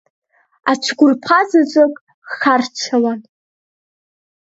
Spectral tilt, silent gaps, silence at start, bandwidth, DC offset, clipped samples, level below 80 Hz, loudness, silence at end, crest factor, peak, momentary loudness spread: -3.5 dB/octave; 2.01-2.07 s, 2.14-2.22 s; 0.65 s; 8 kHz; under 0.1%; under 0.1%; -68 dBFS; -15 LUFS; 1.3 s; 16 dB; 0 dBFS; 12 LU